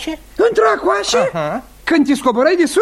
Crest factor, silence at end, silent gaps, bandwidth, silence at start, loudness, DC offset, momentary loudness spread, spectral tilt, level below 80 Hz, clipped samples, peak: 14 dB; 0 s; none; 15 kHz; 0 s; -15 LUFS; under 0.1%; 9 LU; -4 dB/octave; -44 dBFS; under 0.1%; -2 dBFS